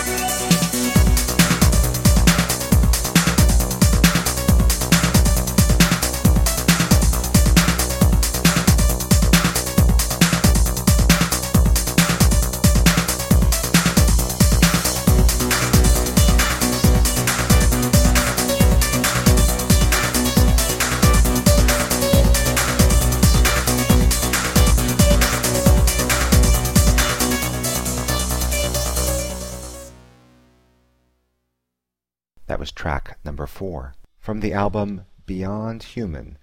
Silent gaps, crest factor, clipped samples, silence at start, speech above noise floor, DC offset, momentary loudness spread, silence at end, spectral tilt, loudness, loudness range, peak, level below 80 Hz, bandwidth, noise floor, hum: none; 16 dB; under 0.1%; 0 s; 64 dB; under 0.1%; 11 LU; 0.05 s; -4 dB/octave; -17 LUFS; 11 LU; 0 dBFS; -20 dBFS; 17 kHz; -89 dBFS; none